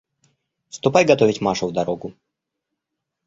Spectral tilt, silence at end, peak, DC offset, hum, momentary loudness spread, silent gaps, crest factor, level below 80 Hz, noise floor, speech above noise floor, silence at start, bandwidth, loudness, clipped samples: -5 dB/octave; 1.15 s; -2 dBFS; under 0.1%; none; 18 LU; none; 20 dB; -58 dBFS; -81 dBFS; 62 dB; 0.75 s; 7.8 kHz; -19 LUFS; under 0.1%